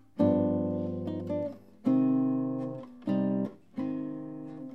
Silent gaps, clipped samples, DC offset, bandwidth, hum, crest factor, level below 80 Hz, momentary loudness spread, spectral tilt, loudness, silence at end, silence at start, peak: none; under 0.1%; 0.1%; 4.4 kHz; none; 18 dB; -76 dBFS; 13 LU; -10.5 dB/octave; -31 LUFS; 0 s; 0.15 s; -14 dBFS